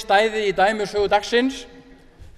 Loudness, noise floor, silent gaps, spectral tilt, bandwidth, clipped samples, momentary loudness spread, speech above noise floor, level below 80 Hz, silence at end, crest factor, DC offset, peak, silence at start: -20 LUFS; -45 dBFS; none; -3.5 dB/octave; 13.5 kHz; under 0.1%; 6 LU; 26 dB; -48 dBFS; 0.15 s; 18 dB; under 0.1%; -4 dBFS; 0 s